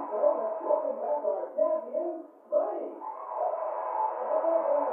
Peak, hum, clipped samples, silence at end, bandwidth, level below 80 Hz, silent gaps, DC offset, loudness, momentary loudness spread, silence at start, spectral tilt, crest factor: -14 dBFS; none; under 0.1%; 0 s; 2.8 kHz; under -90 dBFS; none; under 0.1%; -30 LUFS; 10 LU; 0 s; -8 dB/octave; 16 dB